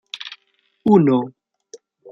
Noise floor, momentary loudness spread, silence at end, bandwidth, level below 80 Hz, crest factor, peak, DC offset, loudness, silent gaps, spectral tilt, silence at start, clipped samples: -64 dBFS; 19 LU; 0.35 s; 7.2 kHz; -64 dBFS; 18 dB; -2 dBFS; under 0.1%; -17 LUFS; none; -8 dB/octave; 0.15 s; under 0.1%